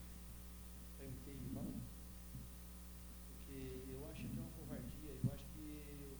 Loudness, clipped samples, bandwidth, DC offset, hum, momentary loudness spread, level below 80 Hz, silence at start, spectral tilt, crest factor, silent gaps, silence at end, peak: -51 LUFS; under 0.1%; over 20 kHz; under 0.1%; none; 10 LU; -56 dBFS; 0 s; -6 dB/octave; 22 dB; none; 0 s; -28 dBFS